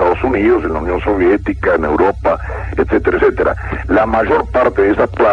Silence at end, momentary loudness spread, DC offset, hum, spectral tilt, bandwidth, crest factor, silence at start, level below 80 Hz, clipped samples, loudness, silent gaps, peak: 0 s; 5 LU; under 0.1%; none; -8.5 dB/octave; 7.2 kHz; 14 dB; 0 s; -28 dBFS; under 0.1%; -14 LUFS; none; 0 dBFS